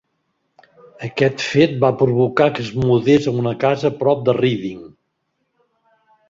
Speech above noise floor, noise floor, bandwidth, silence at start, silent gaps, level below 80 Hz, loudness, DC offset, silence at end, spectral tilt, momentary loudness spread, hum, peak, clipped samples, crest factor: 55 dB; -71 dBFS; 7.6 kHz; 1 s; none; -52 dBFS; -17 LUFS; under 0.1%; 1.45 s; -7 dB/octave; 11 LU; none; 0 dBFS; under 0.1%; 18 dB